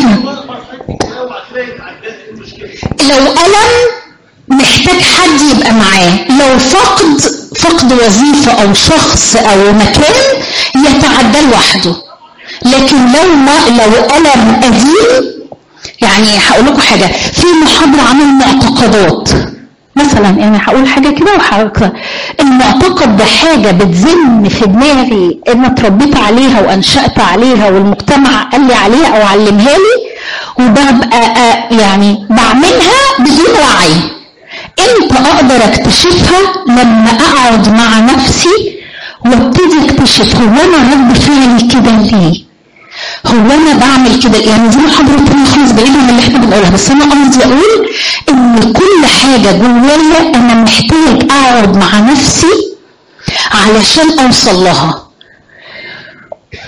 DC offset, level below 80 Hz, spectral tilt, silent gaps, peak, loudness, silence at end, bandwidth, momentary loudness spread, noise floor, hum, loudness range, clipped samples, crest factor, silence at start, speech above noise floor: 2%; -28 dBFS; -4 dB/octave; none; 0 dBFS; -5 LUFS; 0 s; 11.5 kHz; 9 LU; -40 dBFS; none; 2 LU; 0.2%; 6 dB; 0 s; 35 dB